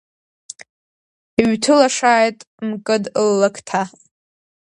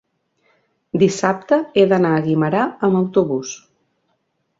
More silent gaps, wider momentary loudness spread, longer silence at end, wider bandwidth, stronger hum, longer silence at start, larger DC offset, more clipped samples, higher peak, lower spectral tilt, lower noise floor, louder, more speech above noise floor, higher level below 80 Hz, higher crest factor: first, 2.47-2.58 s vs none; first, 21 LU vs 11 LU; second, 0.8 s vs 1.05 s; first, 11 kHz vs 8 kHz; neither; first, 1.4 s vs 0.95 s; neither; neither; about the same, 0 dBFS vs -2 dBFS; second, -4 dB/octave vs -6 dB/octave; first, under -90 dBFS vs -69 dBFS; about the same, -17 LUFS vs -17 LUFS; first, over 73 dB vs 52 dB; about the same, -60 dBFS vs -60 dBFS; about the same, 18 dB vs 18 dB